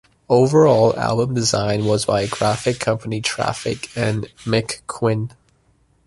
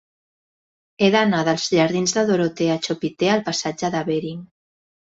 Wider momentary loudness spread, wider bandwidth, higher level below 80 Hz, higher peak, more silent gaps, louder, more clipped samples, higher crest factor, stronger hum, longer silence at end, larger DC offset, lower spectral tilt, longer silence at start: first, 11 LU vs 8 LU; first, 11.5 kHz vs 8 kHz; first, -48 dBFS vs -62 dBFS; about the same, -2 dBFS vs -2 dBFS; neither; about the same, -19 LUFS vs -20 LUFS; neither; about the same, 18 dB vs 20 dB; neither; about the same, 0.8 s vs 0.7 s; neither; about the same, -5 dB/octave vs -4.5 dB/octave; second, 0.3 s vs 1 s